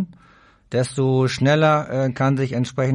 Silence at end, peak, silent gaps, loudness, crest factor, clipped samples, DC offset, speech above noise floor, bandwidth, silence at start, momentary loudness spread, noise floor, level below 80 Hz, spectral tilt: 0 s; -6 dBFS; none; -20 LUFS; 14 dB; under 0.1%; under 0.1%; 33 dB; 11 kHz; 0 s; 7 LU; -52 dBFS; -54 dBFS; -6.5 dB/octave